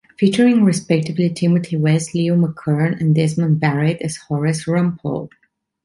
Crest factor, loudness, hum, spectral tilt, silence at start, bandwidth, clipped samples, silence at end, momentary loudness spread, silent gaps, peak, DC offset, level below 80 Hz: 14 dB; -18 LUFS; none; -7 dB/octave; 0.2 s; 11.5 kHz; under 0.1%; 0.55 s; 9 LU; none; -2 dBFS; under 0.1%; -56 dBFS